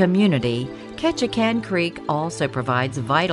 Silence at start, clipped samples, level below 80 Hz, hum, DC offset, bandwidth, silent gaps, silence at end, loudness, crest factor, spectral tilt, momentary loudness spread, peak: 0 s; under 0.1%; -52 dBFS; none; under 0.1%; 11.5 kHz; none; 0 s; -22 LUFS; 18 dB; -6 dB/octave; 6 LU; -4 dBFS